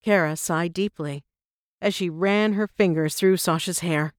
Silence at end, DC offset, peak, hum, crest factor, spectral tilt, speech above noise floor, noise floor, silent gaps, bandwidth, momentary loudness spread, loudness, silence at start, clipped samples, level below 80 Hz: 0.1 s; under 0.1%; -6 dBFS; none; 16 dB; -5 dB/octave; over 67 dB; under -90 dBFS; 1.45-1.78 s; 20 kHz; 7 LU; -23 LUFS; 0.05 s; under 0.1%; -64 dBFS